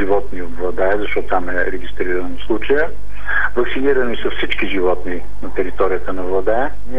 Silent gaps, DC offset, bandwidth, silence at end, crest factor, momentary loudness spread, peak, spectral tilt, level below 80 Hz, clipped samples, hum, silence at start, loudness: none; 30%; 10.5 kHz; 0 s; 16 dB; 7 LU; -2 dBFS; -6.5 dB/octave; -32 dBFS; under 0.1%; 50 Hz at -35 dBFS; 0 s; -20 LUFS